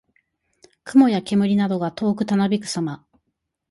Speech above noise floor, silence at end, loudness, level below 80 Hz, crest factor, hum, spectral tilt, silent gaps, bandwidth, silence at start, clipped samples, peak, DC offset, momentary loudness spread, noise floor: 57 dB; 0.75 s; -20 LUFS; -62 dBFS; 18 dB; none; -6.5 dB/octave; none; 11.5 kHz; 0.85 s; under 0.1%; -4 dBFS; under 0.1%; 12 LU; -77 dBFS